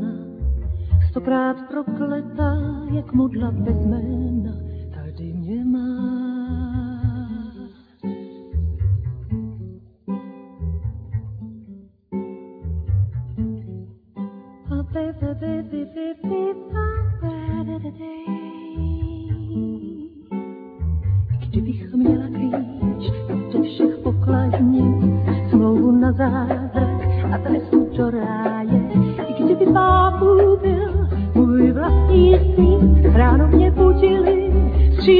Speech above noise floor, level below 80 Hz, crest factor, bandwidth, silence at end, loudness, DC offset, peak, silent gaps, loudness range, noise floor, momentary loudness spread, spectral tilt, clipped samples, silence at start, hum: 22 dB; -26 dBFS; 18 dB; 4.9 kHz; 0 s; -19 LUFS; under 0.1%; -2 dBFS; none; 14 LU; -43 dBFS; 18 LU; -11.5 dB/octave; under 0.1%; 0 s; none